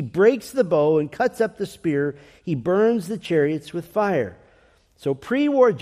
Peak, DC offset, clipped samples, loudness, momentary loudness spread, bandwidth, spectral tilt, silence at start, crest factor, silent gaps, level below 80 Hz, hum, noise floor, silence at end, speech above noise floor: -4 dBFS; under 0.1%; under 0.1%; -22 LUFS; 10 LU; 15 kHz; -7 dB/octave; 0 s; 16 dB; none; -60 dBFS; none; -57 dBFS; 0 s; 36 dB